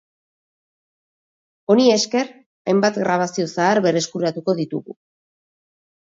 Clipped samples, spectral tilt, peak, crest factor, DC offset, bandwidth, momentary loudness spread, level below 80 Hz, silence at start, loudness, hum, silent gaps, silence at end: under 0.1%; -4.5 dB/octave; -2 dBFS; 20 dB; under 0.1%; 8 kHz; 13 LU; -70 dBFS; 1.7 s; -19 LUFS; none; 2.46-2.65 s; 1.25 s